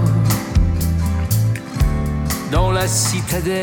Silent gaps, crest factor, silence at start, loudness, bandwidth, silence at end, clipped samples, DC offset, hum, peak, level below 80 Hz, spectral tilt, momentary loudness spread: none; 14 dB; 0 s; -18 LUFS; over 20 kHz; 0 s; under 0.1%; under 0.1%; none; -4 dBFS; -24 dBFS; -5 dB/octave; 4 LU